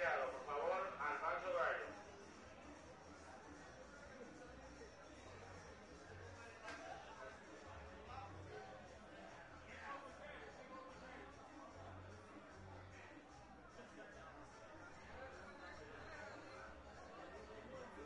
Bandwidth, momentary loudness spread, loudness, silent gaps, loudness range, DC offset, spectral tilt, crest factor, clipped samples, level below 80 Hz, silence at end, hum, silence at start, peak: 10.5 kHz; 16 LU; -52 LUFS; none; 12 LU; under 0.1%; -4.5 dB/octave; 24 dB; under 0.1%; -70 dBFS; 0 s; none; 0 s; -28 dBFS